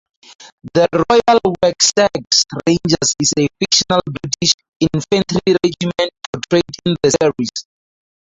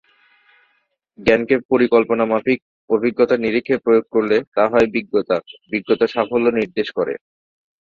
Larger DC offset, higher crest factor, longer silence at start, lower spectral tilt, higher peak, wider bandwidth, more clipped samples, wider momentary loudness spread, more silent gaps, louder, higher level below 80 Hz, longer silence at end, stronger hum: neither; about the same, 16 dB vs 16 dB; second, 0.4 s vs 1.2 s; second, -3.5 dB/octave vs -7 dB/octave; about the same, 0 dBFS vs -2 dBFS; first, 8 kHz vs 7.2 kHz; neither; about the same, 8 LU vs 7 LU; about the same, 0.52-0.58 s, 4.54-4.59 s, 4.68-4.80 s, 6.26-6.33 s vs 1.65-1.69 s, 2.62-2.88 s, 4.47-4.52 s; first, -15 LUFS vs -18 LUFS; first, -46 dBFS vs -52 dBFS; about the same, 0.7 s vs 0.75 s; neither